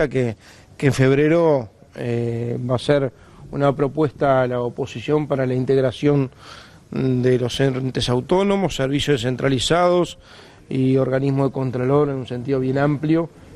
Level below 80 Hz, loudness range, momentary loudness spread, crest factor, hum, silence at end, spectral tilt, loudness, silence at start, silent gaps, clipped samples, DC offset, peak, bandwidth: -46 dBFS; 1 LU; 10 LU; 18 dB; none; 0 s; -6.5 dB/octave; -20 LUFS; 0 s; none; under 0.1%; under 0.1%; -2 dBFS; 12 kHz